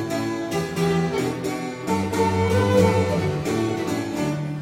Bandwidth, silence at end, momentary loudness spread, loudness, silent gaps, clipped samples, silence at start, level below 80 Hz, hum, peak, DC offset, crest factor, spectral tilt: 16.5 kHz; 0 s; 8 LU; -23 LUFS; none; under 0.1%; 0 s; -50 dBFS; none; -6 dBFS; under 0.1%; 16 dB; -6 dB/octave